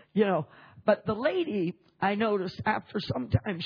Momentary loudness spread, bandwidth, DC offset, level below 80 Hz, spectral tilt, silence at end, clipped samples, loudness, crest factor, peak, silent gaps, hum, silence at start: 6 LU; 5.4 kHz; under 0.1%; -54 dBFS; -8.5 dB/octave; 0 s; under 0.1%; -29 LUFS; 20 dB; -10 dBFS; none; none; 0.15 s